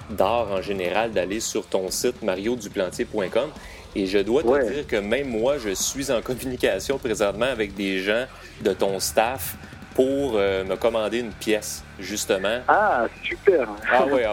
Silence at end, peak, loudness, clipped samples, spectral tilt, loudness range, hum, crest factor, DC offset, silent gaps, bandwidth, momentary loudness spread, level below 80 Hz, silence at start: 0 s; -4 dBFS; -24 LUFS; under 0.1%; -3.5 dB/octave; 2 LU; none; 20 dB; under 0.1%; none; 17 kHz; 7 LU; -46 dBFS; 0 s